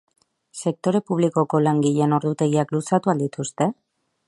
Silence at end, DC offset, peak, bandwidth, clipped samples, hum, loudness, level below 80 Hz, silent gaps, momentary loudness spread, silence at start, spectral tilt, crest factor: 0.55 s; under 0.1%; -4 dBFS; 11.5 kHz; under 0.1%; none; -22 LUFS; -68 dBFS; none; 7 LU; 0.55 s; -7 dB/octave; 18 dB